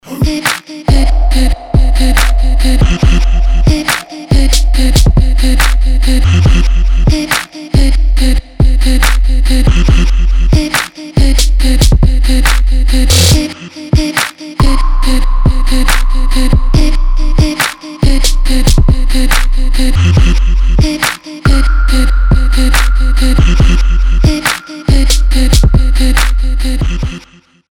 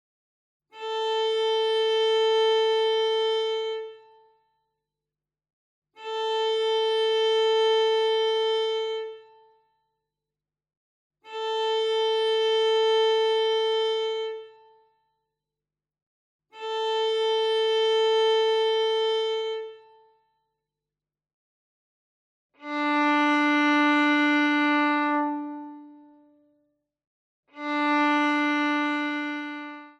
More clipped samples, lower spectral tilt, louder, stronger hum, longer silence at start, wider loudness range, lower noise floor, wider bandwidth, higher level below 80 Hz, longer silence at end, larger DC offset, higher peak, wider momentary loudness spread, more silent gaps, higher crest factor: first, 0.1% vs under 0.1%; first, -4.5 dB/octave vs -1.5 dB/octave; first, -11 LUFS vs -24 LUFS; second, none vs 50 Hz at -90 dBFS; second, 0.05 s vs 0.75 s; second, 2 LU vs 9 LU; second, -41 dBFS vs under -90 dBFS; first, 16.5 kHz vs 9.8 kHz; first, -8 dBFS vs under -90 dBFS; first, 0.5 s vs 0.1 s; neither; first, 0 dBFS vs -14 dBFS; second, 6 LU vs 13 LU; second, none vs 5.53-5.82 s, 10.77-11.10 s, 16.02-16.39 s, 21.34-22.50 s, 27.07-27.43 s; second, 8 dB vs 14 dB